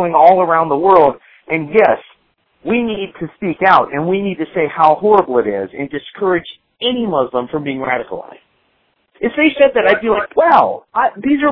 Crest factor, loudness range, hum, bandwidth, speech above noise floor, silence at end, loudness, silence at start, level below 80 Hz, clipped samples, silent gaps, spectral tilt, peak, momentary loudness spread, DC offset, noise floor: 14 dB; 5 LU; none; 5.4 kHz; 48 dB; 0 s; -14 LUFS; 0 s; -52 dBFS; 0.1%; none; -8 dB/octave; 0 dBFS; 13 LU; under 0.1%; -61 dBFS